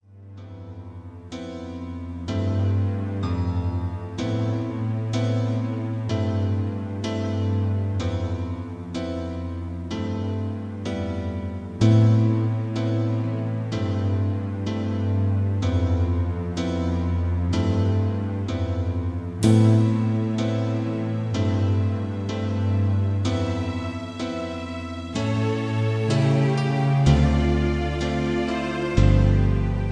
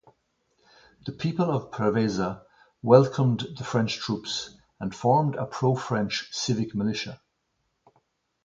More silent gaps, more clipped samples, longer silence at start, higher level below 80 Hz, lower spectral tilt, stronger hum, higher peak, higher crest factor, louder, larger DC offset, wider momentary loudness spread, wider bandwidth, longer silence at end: neither; neither; second, 0.1 s vs 1.05 s; first, -34 dBFS vs -60 dBFS; first, -7.5 dB/octave vs -6 dB/octave; neither; about the same, -4 dBFS vs -2 dBFS; second, 18 dB vs 26 dB; about the same, -24 LUFS vs -26 LUFS; neither; second, 12 LU vs 16 LU; first, 10.5 kHz vs 7.8 kHz; second, 0 s vs 1.3 s